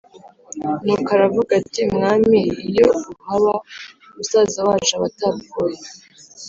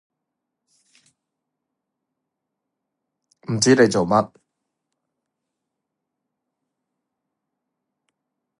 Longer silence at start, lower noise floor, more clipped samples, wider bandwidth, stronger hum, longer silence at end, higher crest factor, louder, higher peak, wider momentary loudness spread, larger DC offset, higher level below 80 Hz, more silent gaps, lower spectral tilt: second, 0.25 s vs 3.5 s; second, -41 dBFS vs -82 dBFS; neither; second, 7.8 kHz vs 11.5 kHz; neither; second, 0 s vs 4.35 s; second, 16 dB vs 24 dB; about the same, -18 LUFS vs -18 LUFS; about the same, -2 dBFS vs -2 dBFS; about the same, 16 LU vs 18 LU; neither; first, -52 dBFS vs -62 dBFS; neither; about the same, -4.5 dB/octave vs -4.5 dB/octave